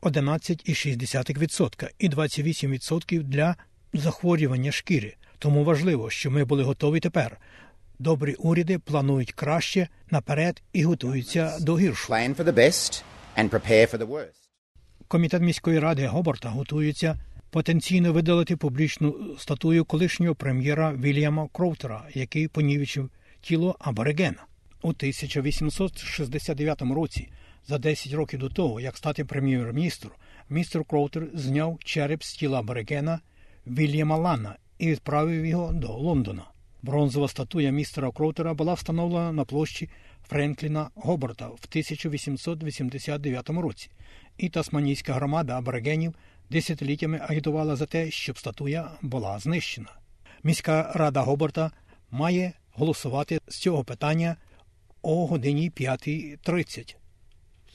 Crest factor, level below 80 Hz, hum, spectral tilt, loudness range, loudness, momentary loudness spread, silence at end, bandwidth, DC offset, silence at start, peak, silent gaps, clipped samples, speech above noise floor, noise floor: 22 dB; -48 dBFS; none; -6 dB/octave; 5 LU; -26 LUFS; 9 LU; 0.65 s; 12.5 kHz; under 0.1%; 0 s; -4 dBFS; 14.58-14.75 s; under 0.1%; 30 dB; -56 dBFS